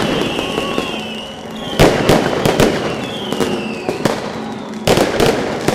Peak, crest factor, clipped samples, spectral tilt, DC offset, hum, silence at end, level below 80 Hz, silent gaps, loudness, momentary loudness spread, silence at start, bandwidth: 0 dBFS; 16 dB; under 0.1%; -4.5 dB/octave; under 0.1%; none; 0 s; -32 dBFS; none; -16 LUFS; 12 LU; 0 s; 17 kHz